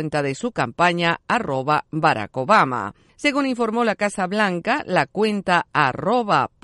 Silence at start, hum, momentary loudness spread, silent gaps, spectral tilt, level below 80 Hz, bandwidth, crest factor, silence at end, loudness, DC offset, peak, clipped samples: 0 s; none; 6 LU; none; -5 dB/octave; -58 dBFS; 11.5 kHz; 18 dB; 0.15 s; -20 LUFS; under 0.1%; -2 dBFS; under 0.1%